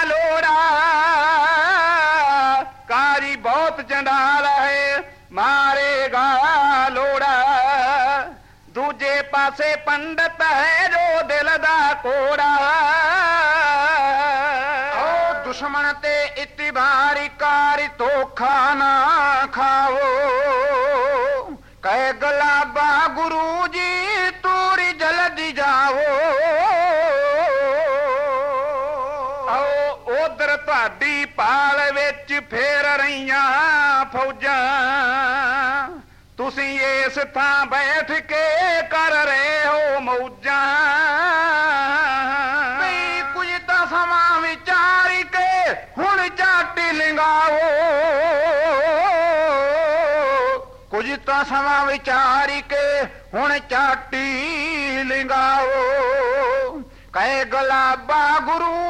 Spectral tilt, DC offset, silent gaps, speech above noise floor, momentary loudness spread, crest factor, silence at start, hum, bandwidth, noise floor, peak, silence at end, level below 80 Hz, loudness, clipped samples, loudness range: -2.5 dB/octave; 0.1%; none; 22 dB; 6 LU; 10 dB; 0 s; none; 12.5 kHz; -41 dBFS; -10 dBFS; 0 s; -50 dBFS; -18 LUFS; under 0.1%; 3 LU